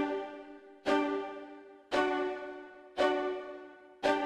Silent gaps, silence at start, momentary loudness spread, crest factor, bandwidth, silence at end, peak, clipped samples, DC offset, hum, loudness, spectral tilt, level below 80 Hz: none; 0 s; 19 LU; 18 dB; 11.5 kHz; 0 s; -16 dBFS; under 0.1%; under 0.1%; none; -34 LUFS; -4 dB/octave; -68 dBFS